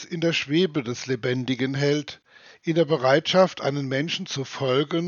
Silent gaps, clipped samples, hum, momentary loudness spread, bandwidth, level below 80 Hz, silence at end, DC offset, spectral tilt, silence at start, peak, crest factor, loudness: none; under 0.1%; none; 8 LU; 7.2 kHz; -70 dBFS; 0 s; under 0.1%; -5.5 dB/octave; 0 s; -4 dBFS; 20 dB; -24 LUFS